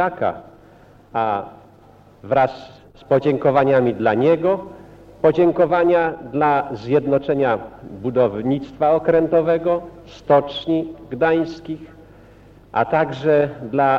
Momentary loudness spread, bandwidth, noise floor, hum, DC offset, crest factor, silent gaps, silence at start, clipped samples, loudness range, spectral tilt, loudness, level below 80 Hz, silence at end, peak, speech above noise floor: 13 LU; 6.8 kHz; -48 dBFS; none; under 0.1%; 16 dB; none; 0 s; under 0.1%; 4 LU; -8.5 dB/octave; -19 LUFS; -50 dBFS; 0 s; -2 dBFS; 30 dB